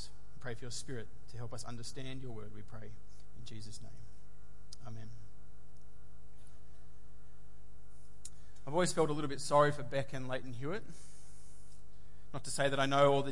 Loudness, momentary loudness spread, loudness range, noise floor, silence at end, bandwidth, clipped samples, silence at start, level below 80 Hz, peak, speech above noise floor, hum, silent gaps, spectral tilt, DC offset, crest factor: -36 LUFS; 26 LU; 21 LU; -59 dBFS; 0 s; 11.5 kHz; under 0.1%; 0 s; -60 dBFS; -16 dBFS; 23 dB; none; none; -4.5 dB/octave; 2%; 24 dB